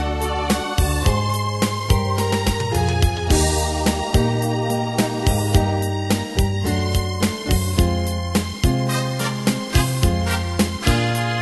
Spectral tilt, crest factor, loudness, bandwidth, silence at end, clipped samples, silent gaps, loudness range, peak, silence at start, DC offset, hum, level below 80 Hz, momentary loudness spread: -5 dB/octave; 16 dB; -20 LUFS; 12.5 kHz; 0 s; under 0.1%; none; 1 LU; -2 dBFS; 0 s; under 0.1%; none; -26 dBFS; 4 LU